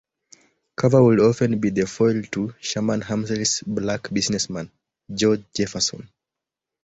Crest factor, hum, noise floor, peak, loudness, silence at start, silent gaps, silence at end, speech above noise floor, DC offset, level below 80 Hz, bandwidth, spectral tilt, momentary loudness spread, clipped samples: 20 dB; none; -86 dBFS; -4 dBFS; -21 LUFS; 0.8 s; none; 0.8 s; 65 dB; under 0.1%; -54 dBFS; 8.2 kHz; -5 dB/octave; 12 LU; under 0.1%